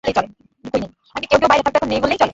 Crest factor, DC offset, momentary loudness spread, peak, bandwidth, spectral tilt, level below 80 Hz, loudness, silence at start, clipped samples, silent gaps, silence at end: 18 dB; under 0.1%; 15 LU; 0 dBFS; 8 kHz; -4.5 dB/octave; -44 dBFS; -17 LUFS; 0.05 s; under 0.1%; none; 0 s